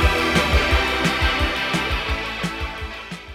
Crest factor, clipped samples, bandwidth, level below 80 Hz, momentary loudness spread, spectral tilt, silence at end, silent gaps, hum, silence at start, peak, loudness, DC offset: 16 dB; under 0.1%; 16 kHz; -26 dBFS; 12 LU; -4.5 dB/octave; 0 s; none; none; 0 s; -4 dBFS; -20 LUFS; under 0.1%